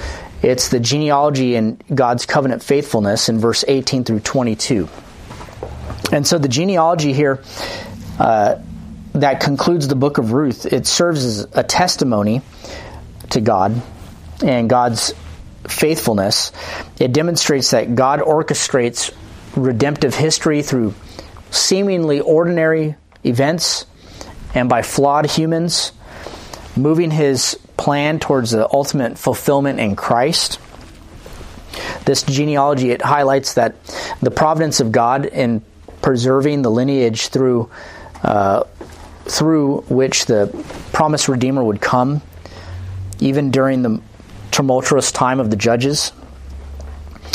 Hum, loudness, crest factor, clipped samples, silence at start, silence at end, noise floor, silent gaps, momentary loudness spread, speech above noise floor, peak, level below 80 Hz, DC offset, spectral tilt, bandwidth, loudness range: none; -16 LUFS; 16 dB; under 0.1%; 0 s; 0 s; -38 dBFS; none; 18 LU; 22 dB; 0 dBFS; -42 dBFS; under 0.1%; -4.5 dB/octave; 15.5 kHz; 2 LU